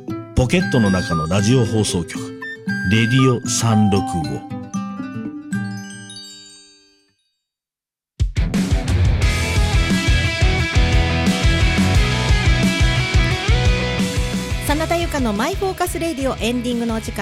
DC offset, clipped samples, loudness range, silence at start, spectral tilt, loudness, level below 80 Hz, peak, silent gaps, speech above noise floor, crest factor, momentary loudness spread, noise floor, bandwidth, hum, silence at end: under 0.1%; under 0.1%; 12 LU; 0 s; -5 dB/octave; -18 LUFS; -24 dBFS; -4 dBFS; none; 72 dB; 14 dB; 12 LU; -90 dBFS; 16 kHz; none; 0 s